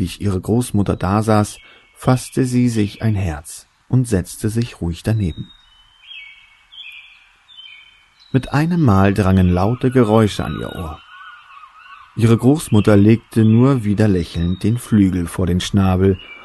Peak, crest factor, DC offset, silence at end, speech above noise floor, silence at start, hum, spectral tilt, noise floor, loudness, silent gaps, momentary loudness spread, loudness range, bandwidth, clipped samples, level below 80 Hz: 0 dBFS; 16 dB; under 0.1%; 0.05 s; 34 dB; 0 s; none; -7 dB/octave; -50 dBFS; -17 LUFS; none; 21 LU; 10 LU; 12.5 kHz; under 0.1%; -38 dBFS